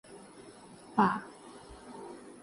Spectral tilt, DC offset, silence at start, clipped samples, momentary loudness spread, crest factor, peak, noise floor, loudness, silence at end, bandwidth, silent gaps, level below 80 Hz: -6 dB/octave; under 0.1%; 0.1 s; under 0.1%; 23 LU; 24 dB; -12 dBFS; -52 dBFS; -31 LUFS; 0.15 s; 11.5 kHz; none; -66 dBFS